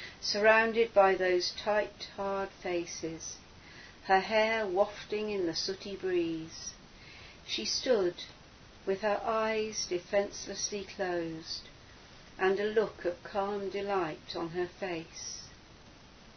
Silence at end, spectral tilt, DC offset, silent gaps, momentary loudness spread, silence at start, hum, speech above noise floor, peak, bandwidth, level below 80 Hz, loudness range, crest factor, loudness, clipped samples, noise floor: 0.05 s; -3 dB/octave; under 0.1%; none; 18 LU; 0 s; none; 23 dB; -12 dBFS; 6.6 kHz; -62 dBFS; 4 LU; 20 dB; -32 LUFS; under 0.1%; -55 dBFS